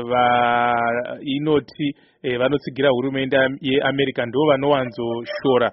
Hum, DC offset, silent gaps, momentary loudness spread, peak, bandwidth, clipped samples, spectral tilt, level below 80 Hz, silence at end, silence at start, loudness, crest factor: none; under 0.1%; none; 9 LU; -4 dBFS; 5.8 kHz; under 0.1%; -3.5 dB/octave; -56 dBFS; 0 s; 0 s; -20 LUFS; 16 dB